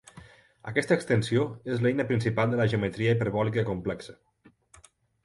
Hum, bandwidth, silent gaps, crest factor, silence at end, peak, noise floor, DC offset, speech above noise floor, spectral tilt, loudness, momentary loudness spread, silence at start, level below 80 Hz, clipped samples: none; 11.5 kHz; none; 20 dB; 1.1 s; -8 dBFS; -58 dBFS; under 0.1%; 31 dB; -7 dB/octave; -27 LUFS; 9 LU; 0.15 s; -56 dBFS; under 0.1%